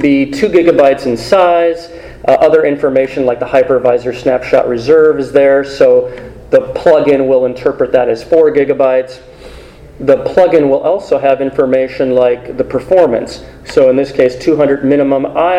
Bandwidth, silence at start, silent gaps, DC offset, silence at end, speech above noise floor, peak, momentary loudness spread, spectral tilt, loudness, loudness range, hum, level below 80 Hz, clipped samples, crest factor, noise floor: 11 kHz; 0 s; none; under 0.1%; 0 s; 23 dB; 0 dBFS; 7 LU; -6.5 dB/octave; -11 LUFS; 2 LU; none; -40 dBFS; 0.5%; 10 dB; -33 dBFS